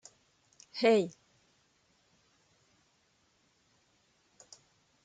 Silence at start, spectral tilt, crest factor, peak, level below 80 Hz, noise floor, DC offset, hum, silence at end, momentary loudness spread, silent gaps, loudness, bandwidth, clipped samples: 0.75 s; -5 dB/octave; 24 dB; -14 dBFS; -84 dBFS; -72 dBFS; under 0.1%; none; 3.95 s; 29 LU; none; -30 LUFS; 9.2 kHz; under 0.1%